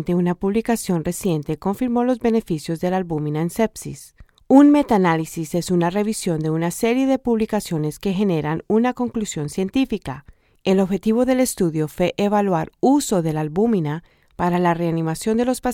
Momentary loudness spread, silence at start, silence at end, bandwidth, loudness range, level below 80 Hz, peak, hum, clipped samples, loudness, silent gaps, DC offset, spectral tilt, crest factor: 7 LU; 0 s; 0 s; 17 kHz; 4 LU; -48 dBFS; 0 dBFS; none; under 0.1%; -20 LUFS; none; under 0.1%; -6 dB/octave; 20 dB